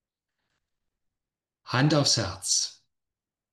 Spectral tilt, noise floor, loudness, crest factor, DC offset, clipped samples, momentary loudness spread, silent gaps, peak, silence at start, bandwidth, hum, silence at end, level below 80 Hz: -3.5 dB/octave; -90 dBFS; -24 LUFS; 22 dB; under 0.1%; under 0.1%; 7 LU; none; -8 dBFS; 1.65 s; 12.5 kHz; none; 0.8 s; -64 dBFS